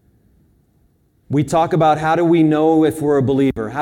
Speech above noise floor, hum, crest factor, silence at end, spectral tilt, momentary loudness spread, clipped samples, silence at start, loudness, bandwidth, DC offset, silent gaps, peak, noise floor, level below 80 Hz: 43 dB; none; 14 dB; 0 s; -7.5 dB/octave; 5 LU; under 0.1%; 1.3 s; -15 LUFS; 14.5 kHz; under 0.1%; none; -4 dBFS; -58 dBFS; -48 dBFS